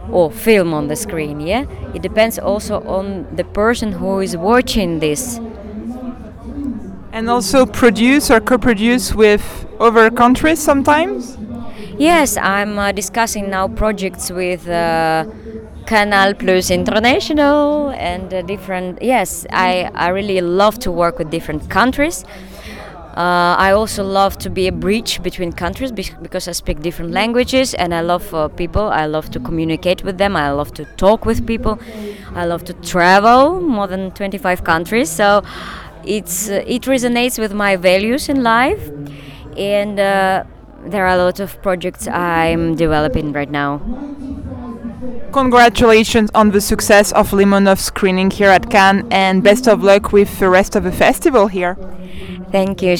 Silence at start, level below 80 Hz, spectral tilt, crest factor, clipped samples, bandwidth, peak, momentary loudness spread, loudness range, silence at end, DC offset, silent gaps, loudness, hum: 0 s; -32 dBFS; -4.5 dB/octave; 14 dB; under 0.1%; over 20 kHz; 0 dBFS; 17 LU; 7 LU; 0 s; under 0.1%; none; -14 LUFS; none